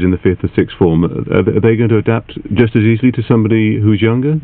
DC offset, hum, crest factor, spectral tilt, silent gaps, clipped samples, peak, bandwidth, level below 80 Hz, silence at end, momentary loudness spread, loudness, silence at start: under 0.1%; none; 12 dB; -12 dB/octave; none; 0.2%; 0 dBFS; 4.1 kHz; -38 dBFS; 0 s; 4 LU; -13 LUFS; 0 s